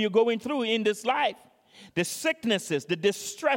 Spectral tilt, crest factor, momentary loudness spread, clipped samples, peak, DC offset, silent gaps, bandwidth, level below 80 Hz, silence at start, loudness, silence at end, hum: -3.5 dB/octave; 18 dB; 5 LU; under 0.1%; -10 dBFS; under 0.1%; none; 17 kHz; -72 dBFS; 0 s; -27 LUFS; 0 s; none